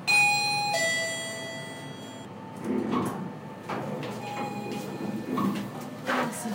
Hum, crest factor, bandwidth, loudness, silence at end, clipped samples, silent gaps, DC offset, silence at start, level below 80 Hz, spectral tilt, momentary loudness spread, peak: none; 16 dB; 16 kHz; -29 LUFS; 0 s; under 0.1%; none; under 0.1%; 0 s; -70 dBFS; -3.5 dB/octave; 15 LU; -14 dBFS